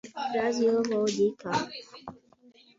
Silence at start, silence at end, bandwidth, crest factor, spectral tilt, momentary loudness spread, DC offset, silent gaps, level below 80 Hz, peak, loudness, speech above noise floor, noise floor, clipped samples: 0.05 s; 0.65 s; 7.8 kHz; 14 dB; -4.5 dB/octave; 20 LU; under 0.1%; none; -70 dBFS; -14 dBFS; -28 LUFS; 31 dB; -59 dBFS; under 0.1%